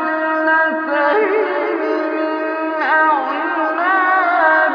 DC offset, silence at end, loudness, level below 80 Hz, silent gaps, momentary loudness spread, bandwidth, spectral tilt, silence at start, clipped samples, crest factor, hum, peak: under 0.1%; 0 s; -16 LUFS; -78 dBFS; none; 6 LU; 5.4 kHz; -4.5 dB/octave; 0 s; under 0.1%; 16 dB; none; 0 dBFS